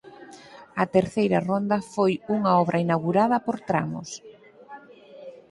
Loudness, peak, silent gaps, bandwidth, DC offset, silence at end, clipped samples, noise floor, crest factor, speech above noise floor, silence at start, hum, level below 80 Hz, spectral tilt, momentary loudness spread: -24 LUFS; -6 dBFS; none; 11.5 kHz; under 0.1%; 0.1 s; under 0.1%; -47 dBFS; 20 dB; 23 dB; 0.05 s; none; -62 dBFS; -7 dB/octave; 23 LU